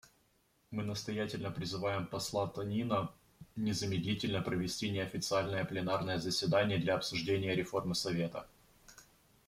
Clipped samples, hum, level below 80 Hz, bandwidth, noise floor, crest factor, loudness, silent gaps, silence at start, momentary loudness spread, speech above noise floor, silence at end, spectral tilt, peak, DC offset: under 0.1%; none; -64 dBFS; 16 kHz; -73 dBFS; 18 dB; -36 LUFS; none; 0.7 s; 7 LU; 38 dB; 0.45 s; -5 dB/octave; -18 dBFS; under 0.1%